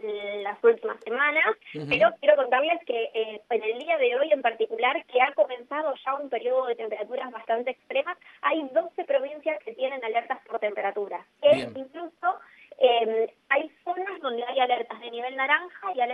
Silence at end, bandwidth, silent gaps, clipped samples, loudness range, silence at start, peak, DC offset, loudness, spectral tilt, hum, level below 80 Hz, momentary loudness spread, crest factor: 0 s; 8.6 kHz; none; under 0.1%; 5 LU; 0.05 s; -6 dBFS; under 0.1%; -26 LUFS; -5.5 dB/octave; none; -72 dBFS; 11 LU; 20 dB